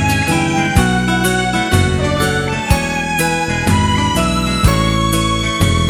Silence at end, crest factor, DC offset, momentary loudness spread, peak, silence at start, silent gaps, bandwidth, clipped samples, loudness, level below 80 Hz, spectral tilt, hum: 0 s; 14 dB; under 0.1%; 2 LU; 0 dBFS; 0 s; none; over 20 kHz; under 0.1%; -15 LUFS; -24 dBFS; -4.5 dB/octave; none